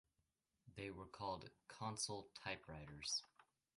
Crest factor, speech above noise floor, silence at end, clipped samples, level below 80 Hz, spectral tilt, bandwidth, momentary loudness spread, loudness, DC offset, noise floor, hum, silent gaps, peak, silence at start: 20 dB; 38 dB; 0.35 s; under 0.1%; -72 dBFS; -2.5 dB/octave; 11.5 kHz; 10 LU; -49 LUFS; under 0.1%; -88 dBFS; none; none; -32 dBFS; 0.65 s